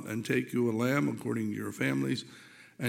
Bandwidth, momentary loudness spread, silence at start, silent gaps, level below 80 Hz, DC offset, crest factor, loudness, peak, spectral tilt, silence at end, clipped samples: 17 kHz; 8 LU; 0 s; none; -74 dBFS; under 0.1%; 18 dB; -31 LUFS; -14 dBFS; -6 dB/octave; 0 s; under 0.1%